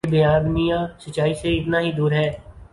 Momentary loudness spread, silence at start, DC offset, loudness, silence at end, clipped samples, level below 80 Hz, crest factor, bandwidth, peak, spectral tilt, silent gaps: 8 LU; 0.05 s; under 0.1%; -21 LUFS; 0.1 s; under 0.1%; -38 dBFS; 14 dB; 11.5 kHz; -6 dBFS; -7 dB/octave; none